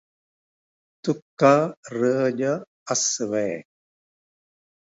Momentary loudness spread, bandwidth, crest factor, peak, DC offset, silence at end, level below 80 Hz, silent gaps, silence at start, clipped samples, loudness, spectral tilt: 12 LU; 8 kHz; 22 dB; -2 dBFS; under 0.1%; 1.25 s; -72 dBFS; 1.22-1.37 s, 1.77-1.83 s, 2.67-2.86 s; 1.05 s; under 0.1%; -23 LUFS; -4 dB/octave